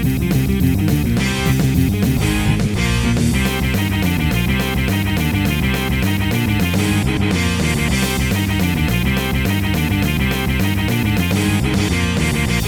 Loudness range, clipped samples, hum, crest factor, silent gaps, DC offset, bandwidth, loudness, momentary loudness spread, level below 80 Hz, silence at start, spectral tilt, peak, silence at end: 1 LU; under 0.1%; none; 14 dB; none; under 0.1%; over 20 kHz; -17 LUFS; 2 LU; -26 dBFS; 0 s; -5.5 dB/octave; -2 dBFS; 0 s